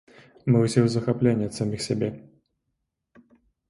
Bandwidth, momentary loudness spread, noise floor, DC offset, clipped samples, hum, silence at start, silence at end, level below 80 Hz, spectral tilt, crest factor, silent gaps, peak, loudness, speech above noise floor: 11.5 kHz; 10 LU; -79 dBFS; under 0.1%; under 0.1%; none; 0.45 s; 1.5 s; -58 dBFS; -7 dB/octave; 20 dB; none; -6 dBFS; -24 LUFS; 56 dB